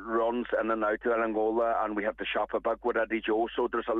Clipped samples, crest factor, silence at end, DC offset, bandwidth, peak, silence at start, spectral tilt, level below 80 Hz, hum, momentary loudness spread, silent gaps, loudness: under 0.1%; 14 dB; 0 s; under 0.1%; 4 kHz; -16 dBFS; 0 s; -7 dB/octave; -58 dBFS; none; 3 LU; none; -29 LUFS